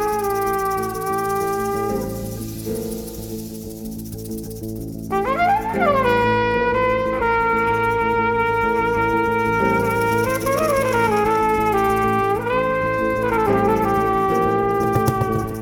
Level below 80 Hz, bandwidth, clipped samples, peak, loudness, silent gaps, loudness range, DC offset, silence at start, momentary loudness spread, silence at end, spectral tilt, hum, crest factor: -40 dBFS; 19.5 kHz; under 0.1%; -6 dBFS; -19 LUFS; none; 7 LU; under 0.1%; 0 s; 12 LU; 0 s; -6 dB/octave; none; 14 dB